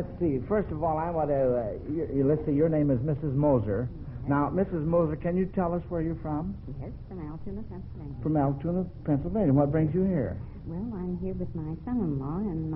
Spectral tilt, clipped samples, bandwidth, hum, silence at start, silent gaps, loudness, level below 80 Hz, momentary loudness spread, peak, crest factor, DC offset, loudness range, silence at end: -11 dB/octave; under 0.1%; 3.7 kHz; none; 0 s; none; -28 LUFS; -44 dBFS; 14 LU; -10 dBFS; 18 dB; under 0.1%; 5 LU; 0 s